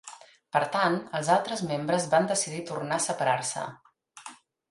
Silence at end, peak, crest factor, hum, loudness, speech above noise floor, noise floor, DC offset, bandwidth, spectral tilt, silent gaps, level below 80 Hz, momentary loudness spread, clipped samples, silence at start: 0.35 s; -8 dBFS; 20 dB; none; -27 LUFS; 22 dB; -49 dBFS; under 0.1%; 11.5 kHz; -3.5 dB/octave; none; -72 dBFS; 21 LU; under 0.1%; 0.05 s